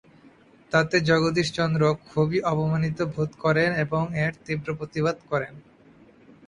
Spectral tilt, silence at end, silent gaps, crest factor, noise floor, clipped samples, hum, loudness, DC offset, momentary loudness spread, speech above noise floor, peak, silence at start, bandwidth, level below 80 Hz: -6.5 dB/octave; 0.85 s; none; 20 dB; -54 dBFS; under 0.1%; none; -24 LUFS; under 0.1%; 8 LU; 30 dB; -6 dBFS; 0.7 s; 10 kHz; -56 dBFS